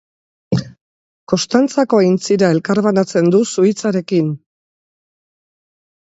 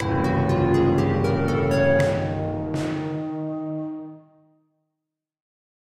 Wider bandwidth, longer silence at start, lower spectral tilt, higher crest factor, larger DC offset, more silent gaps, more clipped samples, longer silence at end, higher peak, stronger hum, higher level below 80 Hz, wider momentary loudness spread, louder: second, 8 kHz vs 12.5 kHz; first, 0.5 s vs 0 s; second, -6 dB/octave vs -7.5 dB/octave; about the same, 16 dB vs 16 dB; neither; first, 0.81-1.27 s vs none; neither; about the same, 1.65 s vs 1.65 s; first, 0 dBFS vs -8 dBFS; neither; second, -56 dBFS vs -46 dBFS; second, 8 LU vs 11 LU; first, -15 LUFS vs -23 LUFS